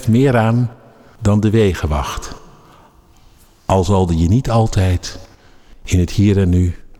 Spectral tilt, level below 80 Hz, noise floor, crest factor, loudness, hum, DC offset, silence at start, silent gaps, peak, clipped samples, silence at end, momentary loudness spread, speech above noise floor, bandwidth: -7 dB/octave; -30 dBFS; -47 dBFS; 12 dB; -16 LUFS; none; under 0.1%; 0 s; none; -4 dBFS; under 0.1%; 0.2 s; 15 LU; 33 dB; 13.5 kHz